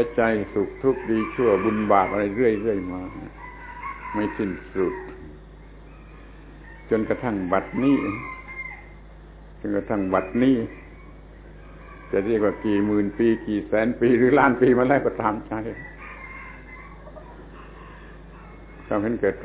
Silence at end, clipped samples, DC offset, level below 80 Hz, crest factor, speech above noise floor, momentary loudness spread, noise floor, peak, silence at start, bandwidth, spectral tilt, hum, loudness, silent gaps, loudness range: 0 s; under 0.1%; under 0.1%; -46 dBFS; 20 dB; 22 dB; 24 LU; -44 dBFS; -4 dBFS; 0 s; 4 kHz; -11 dB/octave; none; -23 LUFS; none; 11 LU